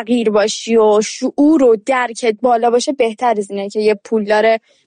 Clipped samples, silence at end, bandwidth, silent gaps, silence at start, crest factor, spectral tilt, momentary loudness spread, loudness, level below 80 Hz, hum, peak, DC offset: under 0.1%; 0.3 s; 10 kHz; none; 0 s; 10 dB; -4 dB/octave; 6 LU; -14 LUFS; -58 dBFS; none; -4 dBFS; under 0.1%